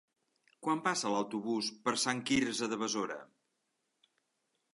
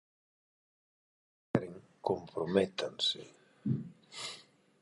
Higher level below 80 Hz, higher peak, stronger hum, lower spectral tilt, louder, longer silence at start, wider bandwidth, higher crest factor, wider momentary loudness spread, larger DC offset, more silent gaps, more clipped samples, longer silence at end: about the same, -72 dBFS vs -70 dBFS; second, -16 dBFS vs -12 dBFS; neither; second, -3 dB/octave vs -5 dB/octave; about the same, -34 LUFS vs -36 LUFS; second, 0.6 s vs 1.55 s; about the same, 11.5 kHz vs 11.5 kHz; second, 20 dB vs 26 dB; second, 6 LU vs 16 LU; neither; neither; neither; first, 1.5 s vs 0.4 s